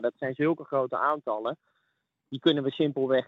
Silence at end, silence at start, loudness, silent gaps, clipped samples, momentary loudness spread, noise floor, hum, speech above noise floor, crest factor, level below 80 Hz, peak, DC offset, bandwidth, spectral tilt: 0.05 s; 0 s; -28 LUFS; none; under 0.1%; 9 LU; -78 dBFS; none; 50 dB; 18 dB; -82 dBFS; -10 dBFS; under 0.1%; 5.6 kHz; -8 dB/octave